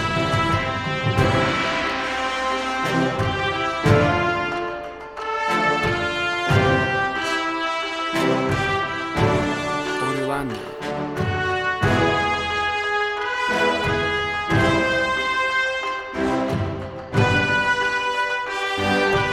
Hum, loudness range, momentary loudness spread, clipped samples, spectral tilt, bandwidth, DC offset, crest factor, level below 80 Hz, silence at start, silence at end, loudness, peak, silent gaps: none; 2 LU; 7 LU; under 0.1%; -5 dB/octave; 15 kHz; under 0.1%; 18 dB; -42 dBFS; 0 s; 0 s; -21 LUFS; -4 dBFS; none